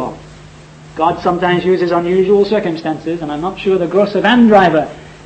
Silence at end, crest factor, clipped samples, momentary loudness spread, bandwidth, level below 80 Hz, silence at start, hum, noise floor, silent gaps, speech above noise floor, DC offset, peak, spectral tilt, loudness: 0.1 s; 14 dB; under 0.1%; 12 LU; 8.6 kHz; -44 dBFS; 0 s; none; -37 dBFS; none; 25 dB; under 0.1%; 0 dBFS; -7 dB/octave; -13 LUFS